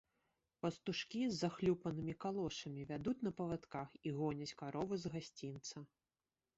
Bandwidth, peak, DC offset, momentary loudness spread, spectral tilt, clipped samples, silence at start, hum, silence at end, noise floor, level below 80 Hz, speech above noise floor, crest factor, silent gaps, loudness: 8 kHz; -24 dBFS; under 0.1%; 10 LU; -5.5 dB/octave; under 0.1%; 0.65 s; none; 0.75 s; under -90 dBFS; -70 dBFS; over 47 dB; 18 dB; none; -43 LUFS